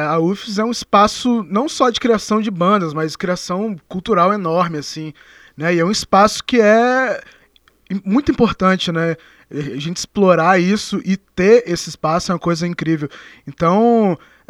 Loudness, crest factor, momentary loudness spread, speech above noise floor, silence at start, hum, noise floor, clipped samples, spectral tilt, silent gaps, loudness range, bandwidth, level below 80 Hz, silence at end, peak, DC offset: -16 LUFS; 16 dB; 13 LU; 38 dB; 0 s; none; -54 dBFS; under 0.1%; -5.5 dB/octave; none; 3 LU; 13 kHz; -48 dBFS; 0.35 s; 0 dBFS; under 0.1%